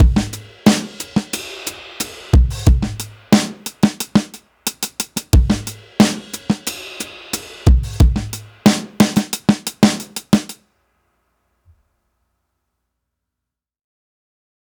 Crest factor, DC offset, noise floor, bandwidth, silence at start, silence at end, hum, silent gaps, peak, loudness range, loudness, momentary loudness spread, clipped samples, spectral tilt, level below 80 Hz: 18 dB; under 0.1%; -83 dBFS; over 20 kHz; 0 s; 4.15 s; none; none; 0 dBFS; 4 LU; -18 LUFS; 12 LU; under 0.1%; -5 dB/octave; -22 dBFS